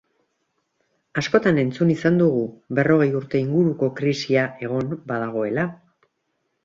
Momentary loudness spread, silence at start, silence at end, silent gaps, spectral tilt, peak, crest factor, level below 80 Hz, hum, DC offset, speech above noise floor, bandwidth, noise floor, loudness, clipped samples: 8 LU; 1.15 s; 0.9 s; none; -7 dB/octave; -2 dBFS; 20 dB; -60 dBFS; none; under 0.1%; 53 dB; 7.6 kHz; -73 dBFS; -21 LUFS; under 0.1%